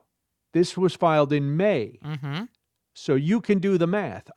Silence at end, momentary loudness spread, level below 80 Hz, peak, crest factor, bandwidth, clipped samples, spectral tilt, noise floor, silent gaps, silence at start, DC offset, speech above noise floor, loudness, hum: 0.05 s; 13 LU; -68 dBFS; -6 dBFS; 18 dB; 11.5 kHz; under 0.1%; -7 dB/octave; -78 dBFS; none; 0.55 s; under 0.1%; 55 dB; -24 LUFS; none